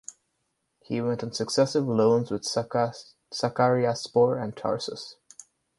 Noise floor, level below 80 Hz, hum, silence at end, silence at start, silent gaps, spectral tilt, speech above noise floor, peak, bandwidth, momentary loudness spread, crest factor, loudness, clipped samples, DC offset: -77 dBFS; -66 dBFS; none; 0.65 s; 0.1 s; none; -5.5 dB/octave; 51 dB; -8 dBFS; 11.5 kHz; 13 LU; 20 dB; -26 LUFS; under 0.1%; under 0.1%